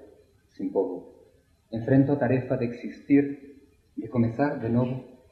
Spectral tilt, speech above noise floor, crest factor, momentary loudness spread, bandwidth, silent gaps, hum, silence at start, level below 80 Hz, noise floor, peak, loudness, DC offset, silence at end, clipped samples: -10.5 dB/octave; 35 dB; 18 dB; 16 LU; 4.7 kHz; none; none; 0 s; -58 dBFS; -60 dBFS; -8 dBFS; -26 LUFS; under 0.1%; 0.15 s; under 0.1%